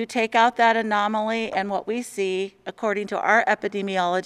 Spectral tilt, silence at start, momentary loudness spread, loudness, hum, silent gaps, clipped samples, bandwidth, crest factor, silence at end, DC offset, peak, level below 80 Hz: -4 dB/octave; 0 s; 9 LU; -22 LUFS; none; none; under 0.1%; 13.5 kHz; 18 dB; 0 s; under 0.1%; -4 dBFS; -68 dBFS